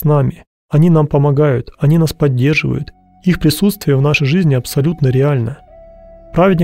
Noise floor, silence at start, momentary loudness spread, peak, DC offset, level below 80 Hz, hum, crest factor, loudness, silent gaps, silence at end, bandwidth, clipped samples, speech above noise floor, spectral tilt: -39 dBFS; 0 s; 9 LU; -2 dBFS; under 0.1%; -38 dBFS; none; 12 dB; -14 LUFS; 0.47-0.69 s; 0 s; 16 kHz; under 0.1%; 26 dB; -7 dB/octave